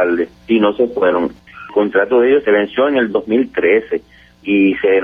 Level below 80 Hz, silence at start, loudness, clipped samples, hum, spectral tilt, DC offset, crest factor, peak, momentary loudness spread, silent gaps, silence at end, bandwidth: -52 dBFS; 0 s; -15 LUFS; under 0.1%; none; -8 dB/octave; under 0.1%; 12 dB; -2 dBFS; 10 LU; none; 0 s; 4.9 kHz